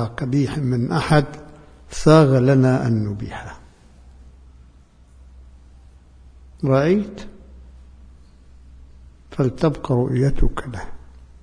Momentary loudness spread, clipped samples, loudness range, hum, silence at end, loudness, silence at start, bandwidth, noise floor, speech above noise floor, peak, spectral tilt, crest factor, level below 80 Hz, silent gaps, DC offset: 21 LU; under 0.1%; 10 LU; none; 0.05 s; -19 LUFS; 0 s; 10.5 kHz; -49 dBFS; 31 dB; 0 dBFS; -7.5 dB/octave; 20 dB; -34 dBFS; none; under 0.1%